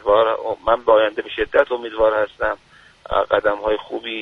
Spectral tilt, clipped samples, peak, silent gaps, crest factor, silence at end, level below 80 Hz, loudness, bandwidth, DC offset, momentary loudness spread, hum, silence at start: -5.5 dB/octave; under 0.1%; 0 dBFS; none; 18 dB; 0 s; -44 dBFS; -19 LUFS; 5.4 kHz; under 0.1%; 9 LU; none; 0.05 s